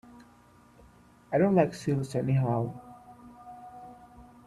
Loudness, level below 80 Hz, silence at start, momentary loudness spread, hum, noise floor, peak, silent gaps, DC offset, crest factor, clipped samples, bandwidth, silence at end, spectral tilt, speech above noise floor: -28 LUFS; -62 dBFS; 1.3 s; 26 LU; 60 Hz at -55 dBFS; -58 dBFS; -12 dBFS; none; under 0.1%; 20 dB; under 0.1%; 12 kHz; 0.25 s; -8 dB/octave; 31 dB